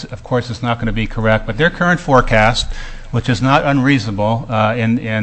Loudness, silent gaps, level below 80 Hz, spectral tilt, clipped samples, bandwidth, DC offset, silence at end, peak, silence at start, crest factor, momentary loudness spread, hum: -15 LUFS; none; -28 dBFS; -6 dB/octave; under 0.1%; 8.6 kHz; under 0.1%; 0 s; 0 dBFS; 0 s; 16 dB; 8 LU; none